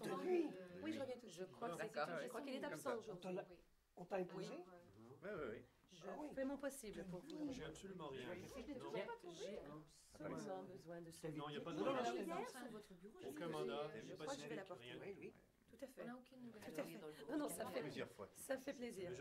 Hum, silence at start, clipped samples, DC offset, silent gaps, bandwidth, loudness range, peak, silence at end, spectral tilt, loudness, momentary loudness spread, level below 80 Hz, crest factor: none; 0 s; under 0.1%; under 0.1%; none; 16 kHz; 5 LU; -32 dBFS; 0 s; -5 dB/octave; -50 LUFS; 13 LU; -78 dBFS; 18 dB